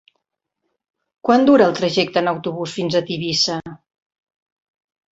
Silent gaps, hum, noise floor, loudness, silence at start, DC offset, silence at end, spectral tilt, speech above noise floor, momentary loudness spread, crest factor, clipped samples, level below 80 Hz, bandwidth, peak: none; none; -77 dBFS; -18 LUFS; 1.25 s; under 0.1%; 1.35 s; -4.5 dB/octave; 60 dB; 12 LU; 20 dB; under 0.1%; -60 dBFS; 8 kHz; -2 dBFS